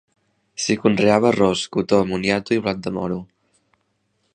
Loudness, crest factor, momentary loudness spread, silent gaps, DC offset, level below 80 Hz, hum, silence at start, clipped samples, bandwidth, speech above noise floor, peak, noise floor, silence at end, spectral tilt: -20 LUFS; 20 dB; 10 LU; none; under 0.1%; -52 dBFS; none; 0.6 s; under 0.1%; 10 kHz; 50 dB; -2 dBFS; -69 dBFS; 1.1 s; -5 dB/octave